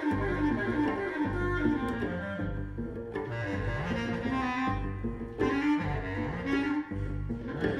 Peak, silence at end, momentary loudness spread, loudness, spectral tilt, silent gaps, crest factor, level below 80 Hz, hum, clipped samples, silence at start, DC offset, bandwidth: -14 dBFS; 0 s; 7 LU; -32 LUFS; -7.5 dB/octave; none; 16 dB; -42 dBFS; none; under 0.1%; 0 s; under 0.1%; 10 kHz